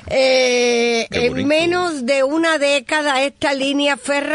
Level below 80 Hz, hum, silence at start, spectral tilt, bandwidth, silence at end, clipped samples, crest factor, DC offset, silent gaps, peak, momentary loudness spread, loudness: -50 dBFS; none; 0.05 s; -3 dB/octave; 11 kHz; 0 s; under 0.1%; 12 dB; under 0.1%; none; -4 dBFS; 5 LU; -16 LUFS